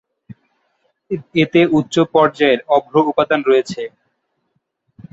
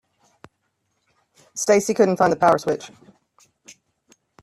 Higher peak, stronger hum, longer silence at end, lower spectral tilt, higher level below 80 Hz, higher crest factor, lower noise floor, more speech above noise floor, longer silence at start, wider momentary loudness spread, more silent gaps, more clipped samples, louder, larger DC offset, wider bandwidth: about the same, -2 dBFS vs -4 dBFS; neither; second, 1.25 s vs 1.55 s; first, -6 dB/octave vs -4.5 dB/octave; first, -58 dBFS vs -64 dBFS; about the same, 16 dB vs 20 dB; about the same, -69 dBFS vs -72 dBFS; about the same, 54 dB vs 54 dB; second, 1.1 s vs 1.55 s; about the same, 14 LU vs 15 LU; neither; neither; first, -15 LUFS vs -19 LUFS; neither; second, 8 kHz vs 14 kHz